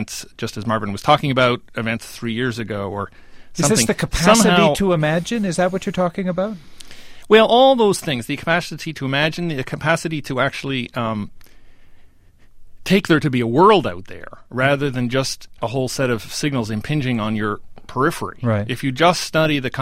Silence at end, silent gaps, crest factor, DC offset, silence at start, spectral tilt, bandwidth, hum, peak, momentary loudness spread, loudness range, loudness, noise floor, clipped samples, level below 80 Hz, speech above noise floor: 0 s; none; 18 dB; under 0.1%; 0 s; -4.5 dB/octave; 16 kHz; none; 0 dBFS; 14 LU; 5 LU; -19 LUFS; -46 dBFS; under 0.1%; -42 dBFS; 28 dB